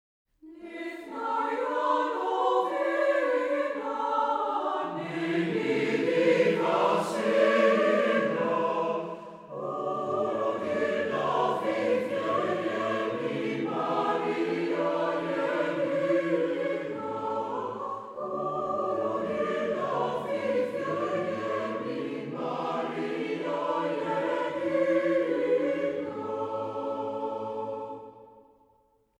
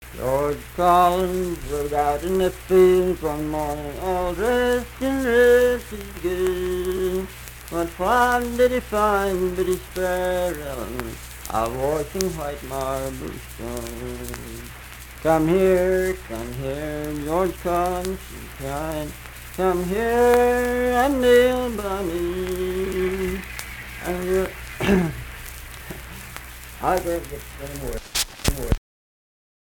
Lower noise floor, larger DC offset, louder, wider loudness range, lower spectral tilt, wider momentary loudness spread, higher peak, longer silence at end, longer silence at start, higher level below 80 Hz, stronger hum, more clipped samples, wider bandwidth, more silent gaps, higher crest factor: second, -67 dBFS vs under -90 dBFS; neither; second, -29 LUFS vs -22 LUFS; about the same, 6 LU vs 7 LU; about the same, -6 dB/octave vs -5 dB/octave; second, 9 LU vs 17 LU; second, -10 dBFS vs 0 dBFS; about the same, 0.8 s vs 0.85 s; first, 0.45 s vs 0 s; second, -74 dBFS vs -38 dBFS; neither; neither; second, 12 kHz vs 19 kHz; neither; about the same, 18 dB vs 22 dB